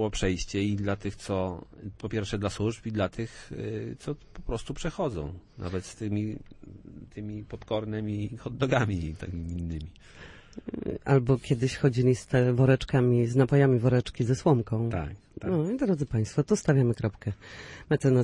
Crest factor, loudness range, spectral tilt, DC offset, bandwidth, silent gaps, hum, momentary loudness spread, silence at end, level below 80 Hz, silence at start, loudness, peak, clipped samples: 20 dB; 11 LU; -7 dB/octave; under 0.1%; 11 kHz; none; none; 16 LU; 0 s; -46 dBFS; 0 s; -28 LUFS; -8 dBFS; under 0.1%